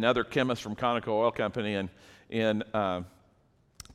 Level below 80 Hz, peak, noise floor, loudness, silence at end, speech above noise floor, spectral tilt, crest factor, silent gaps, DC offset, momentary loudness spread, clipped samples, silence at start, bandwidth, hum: -60 dBFS; -10 dBFS; -66 dBFS; -30 LUFS; 0 s; 36 dB; -6 dB/octave; 20 dB; none; under 0.1%; 10 LU; under 0.1%; 0 s; 15 kHz; none